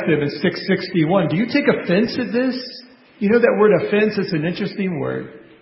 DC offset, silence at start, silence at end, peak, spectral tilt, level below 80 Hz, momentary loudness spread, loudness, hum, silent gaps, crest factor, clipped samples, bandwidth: under 0.1%; 0 s; 0.2 s; -2 dBFS; -10.5 dB/octave; -56 dBFS; 11 LU; -19 LUFS; none; none; 18 dB; under 0.1%; 5.8 kHz